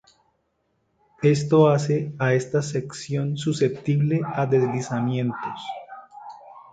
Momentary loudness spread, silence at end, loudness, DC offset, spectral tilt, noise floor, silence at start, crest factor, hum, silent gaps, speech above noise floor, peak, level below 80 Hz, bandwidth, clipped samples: 19 LU; 0.1 s; -23 LUFS; under 0.1%; -7 dB/octave; -71 dBFS; 1.2 s; 20 dB; none; none; 49 dB; -4 dBFS; -62 dBFS; 9.2 kHz; under 0.1%